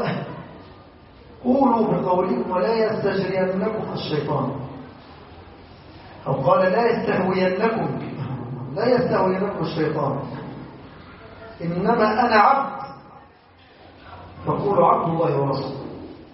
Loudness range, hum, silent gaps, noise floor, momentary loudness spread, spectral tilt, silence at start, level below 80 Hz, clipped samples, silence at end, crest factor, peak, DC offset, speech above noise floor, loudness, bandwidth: 3 LU; none; none; -51 dBFS; 22 LU; -5.5 dB/octave; 0 s; -54 dBFS; under 0.1%; 0.05 s; 18 dB; -4 dBFS; under 0.1%; 30 dB; -21 LUFS; 5.8 kHz